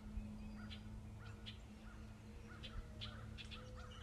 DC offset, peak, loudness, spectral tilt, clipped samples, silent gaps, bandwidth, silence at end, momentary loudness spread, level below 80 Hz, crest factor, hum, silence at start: under 0.1%; -36 dBFS; -54 LUFS; -5.5 dB/octave; under 0.1%; none; 14.5 kHz; 0 s; 6 LU; -56 dBFS; 16 dB; none; 0 s